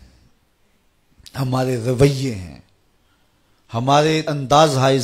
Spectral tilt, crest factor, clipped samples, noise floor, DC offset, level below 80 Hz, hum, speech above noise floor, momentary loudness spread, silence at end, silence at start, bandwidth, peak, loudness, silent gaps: -5.5 dB/octave; 18 dB; under 0.1%; -61 dBFS; under 0.1%; -48 dBFS; none; 44 dB; 16 LU; 0 s; 1.35 s; 15.5 kHz; -2 dBFS; -18 LUFS; none